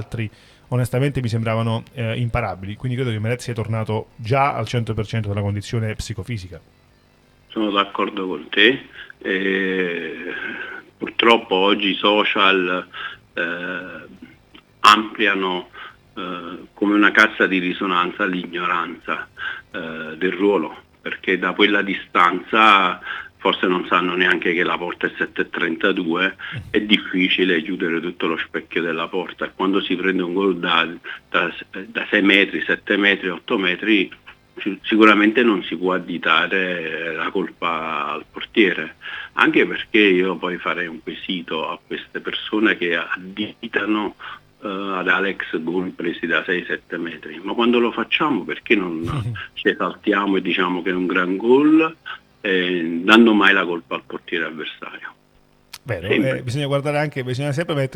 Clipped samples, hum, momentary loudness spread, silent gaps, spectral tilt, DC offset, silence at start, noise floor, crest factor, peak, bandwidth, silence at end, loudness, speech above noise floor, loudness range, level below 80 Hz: under 0.1%; none; 14 LU; none; -5.5 dB/octave; under 0.1%; 0 s; -56 dBFS; 20 dB; 0 dBFS; 18.5 kHz; 0 s; -19 LUFS; 36 dB; 6 LU; -52 dBFS